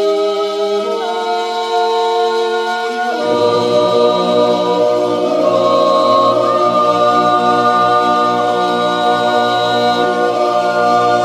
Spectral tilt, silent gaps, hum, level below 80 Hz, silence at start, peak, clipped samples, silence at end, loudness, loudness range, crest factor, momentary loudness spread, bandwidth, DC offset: -4.5 dB/octave; none; none; -62 dBFS; 0 s; 0 dBFS; under 0.1%; 0 s; -13 LUFS; 3 LU; 12 dB; 5 LU; 14 kHz; under 0.1%